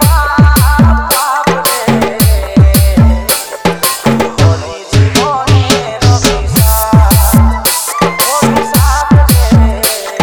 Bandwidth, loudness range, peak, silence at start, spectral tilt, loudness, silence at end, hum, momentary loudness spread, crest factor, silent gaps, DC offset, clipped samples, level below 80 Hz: over 20 kHz; 2 LU; 0 dBFS; 0 s; -5 dB/octave; -9 LUFS; 0 s; none; 5 LU; 8 dB; none; under 0.1%; 2%; -14 dBFS